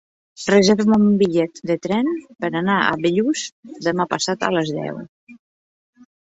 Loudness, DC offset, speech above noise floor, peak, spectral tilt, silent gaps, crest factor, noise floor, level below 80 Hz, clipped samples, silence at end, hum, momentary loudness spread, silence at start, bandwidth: -19 LUFS; under 0.1%; over 71 dB; -2 dBFS; -5 dB/octave; 3.52-3.63 s, 5.09-5.27 s; 18 dB; under -90 dBFS; -58 dBFS; under 0.1%; 0.95 s; none; 11 LU; 0.4 s; 8 kHz